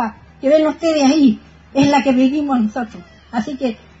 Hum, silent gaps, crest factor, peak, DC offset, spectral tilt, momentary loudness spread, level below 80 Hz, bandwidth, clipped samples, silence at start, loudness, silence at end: none; none; 14 dB; -2 dBFS; under 0.1%; -5.5 dB/octave; 12 LU; -48 dBFS; 8 kHz; under 0.1%; 0 s; -16 LUFS; 0.25 s